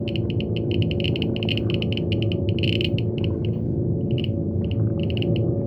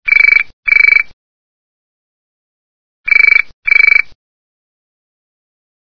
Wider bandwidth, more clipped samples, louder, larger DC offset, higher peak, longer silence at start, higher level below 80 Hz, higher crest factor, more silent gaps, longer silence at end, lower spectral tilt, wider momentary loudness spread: about the same, 5.6 kHz vs 5.4 kHz; second, under 0.1% vs 0.7%; second, -24 LUFS vs -7 LUFS; second, under 0.1% vs 2%; second, -8 dBFS vs 0 dBFS; about the same, 0 s vs 0.05 s; first, -40 dBFS vs -46 dBFS; about the same, 14 dB vs 14 dB; second, none vs 0.53-0.63 s, 1.13-3.04 s, 3.53-3.63 s; second, 0 s vs 1.95 s; first, -9 dB/octave vs -1 dB/octave; second, 3 LU vs 12 LU